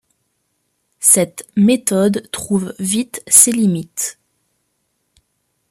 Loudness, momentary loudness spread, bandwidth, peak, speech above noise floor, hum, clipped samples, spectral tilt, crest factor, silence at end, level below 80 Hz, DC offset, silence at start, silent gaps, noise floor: -14 LUFS; 13 LU; 15 kHz; 0 dBFS; 53 dB; none; under 0.1%; -4 dB/octave; 18 dB; 1.6 s; -58 dBFS; under 0.1%; 1 s; none; -68 dBFS